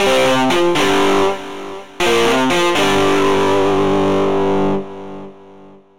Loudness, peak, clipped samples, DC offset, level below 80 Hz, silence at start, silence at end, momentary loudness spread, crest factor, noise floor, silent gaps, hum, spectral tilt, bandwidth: -15 LUFS; -4 dBFS; under 0.1%; 5%; -42 dBFS; 0 s; 0 s; 16 LU; 12 dB; -42 dBFS; none; 50 Hz at -50 dBFS; -4 dB/octave; 16.5 kHz